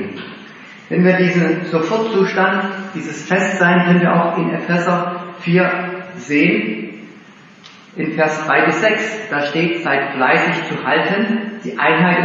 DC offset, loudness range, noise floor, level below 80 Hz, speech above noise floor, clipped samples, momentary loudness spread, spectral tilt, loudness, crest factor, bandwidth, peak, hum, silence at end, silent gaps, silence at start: under 0.1%; 3 LU; -42 dBFS; -70 dBFS; 26 dB; under 0.1%; 13 LU; -6 dB/octave; -16 LUFS; 16 dB; 7.8 kHz; 0 dBFS; none; 0 s; none; 0 s